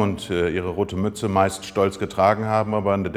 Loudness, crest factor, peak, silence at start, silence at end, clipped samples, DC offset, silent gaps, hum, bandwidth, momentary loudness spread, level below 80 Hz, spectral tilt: -22 LUFS; 18 dB; -2 dBFS; 0 s; 0 s; under 0.1%; under 0.1%; none; none; 15.5 kHz; 5 LU; -50 dBFS; -6 dB/octave